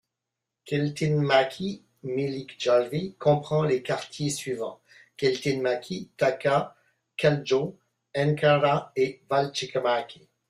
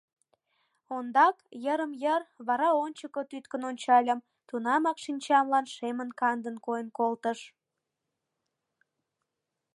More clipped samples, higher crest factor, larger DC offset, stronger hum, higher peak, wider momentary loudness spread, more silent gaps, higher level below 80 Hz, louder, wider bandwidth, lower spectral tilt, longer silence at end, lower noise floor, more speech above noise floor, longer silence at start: neither; about the same, 18 dB vs 20 dB; neither; neither; about the same, -8 dBFS vs -10 dBFS; about the same, 12 LU vs 13 LU; neither; first, -64 dBFS vs -88 dBFS; first, -26 LUFS vs -29 LUFS; first, 13 kHz vs 11.5 kHz; first, -5.5 dB/octave vs -3.5 dB/octave; second, 0.35 s vs 2.25 s; about the same, -86 dBFS vs -86 dBFS; about the same, 60 dB vs 57 dB; second, 0.65 s vs 0.9 s